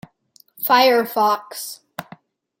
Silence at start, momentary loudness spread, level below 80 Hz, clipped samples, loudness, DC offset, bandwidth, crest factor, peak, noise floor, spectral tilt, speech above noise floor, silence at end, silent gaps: 0.6 s; 21 LU; -72 dBFS; under 0.1%; -17 LUFS; under 0.1%; 17 kHz; 20 dB; -2 dBFS; -56 dBFS; -2.5 dB/octave; 38 dB; 0.6 s; none